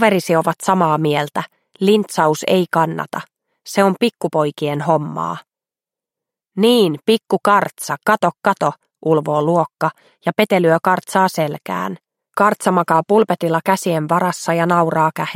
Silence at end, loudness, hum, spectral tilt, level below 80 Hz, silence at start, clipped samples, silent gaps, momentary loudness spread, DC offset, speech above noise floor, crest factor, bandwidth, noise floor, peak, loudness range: 0 s; -17 LUFS; none; -5.5 dB/octave; -66 dBFS; 0 s; under 0.1%; none; 10 LU; under 0.1%; 73 dB; 16 dB; 16.5 kHz; -90 dBFS; 0 dBFS; 3 LU